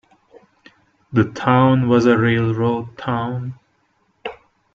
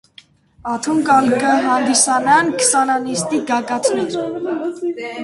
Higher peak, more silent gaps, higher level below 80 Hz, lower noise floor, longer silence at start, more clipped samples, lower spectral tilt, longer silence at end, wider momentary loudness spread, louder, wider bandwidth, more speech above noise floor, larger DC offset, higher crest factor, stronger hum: about the same, -2 dBFS vs 0 dBFS; neither; about the same, -54 dBFS vs -58 dBFS; first, -63 dBFS vs -48 dBFS; first, 1.1 s vs 0.65 s; neither; first, -8 dB/octave vs -2.5 dB/octave; first, 0.4 s vs 0 s; first, 19 LU vs 10 LU; about the same, -18 LUFS vs -16 LUFS; second, 7.2 kHz vs 11.5 kHz; first, 47 dB vs 31 dB; neither; about the same, 18 dB vs 16 dB; neither